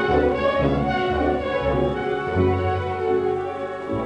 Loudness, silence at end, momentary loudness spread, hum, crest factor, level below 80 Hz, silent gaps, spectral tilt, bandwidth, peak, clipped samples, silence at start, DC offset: -22 LUFS; 0 s; 5 LU; none; 14 dB; -36 dBFS; none; -8 dB/octave; 9.4 kHz; -6 dBFS; under 0.1%; 0 s; under 0.1%